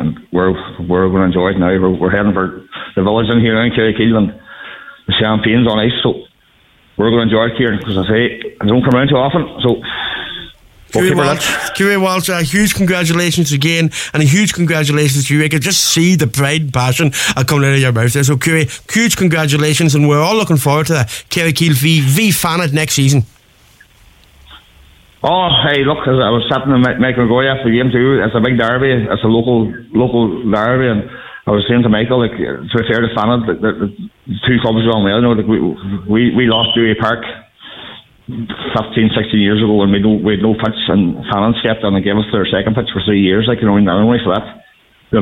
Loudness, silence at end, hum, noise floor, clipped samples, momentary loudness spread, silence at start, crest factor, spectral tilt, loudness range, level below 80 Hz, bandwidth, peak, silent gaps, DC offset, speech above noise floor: -13 LUFS; 0 s; none; -51 dBFS; under 0.1%; 8 LU; 0 s; 12 dB; -5 dB/octave; 3 LU; -40 dBFS; 16.5 kHz; -2 dBFS; none; under 0.1%; 38 dB